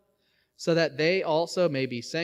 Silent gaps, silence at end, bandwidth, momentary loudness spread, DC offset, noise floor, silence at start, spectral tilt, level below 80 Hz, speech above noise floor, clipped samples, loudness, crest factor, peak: none; 0 s; 13 kHz; 7 LU; under 0.1%; -71 dBFS; 0.6 s; -5 dB/octave; -74 dBFS; 45 dB; under 0.1%; -26 LUFS; 16 dB; -10 dBFS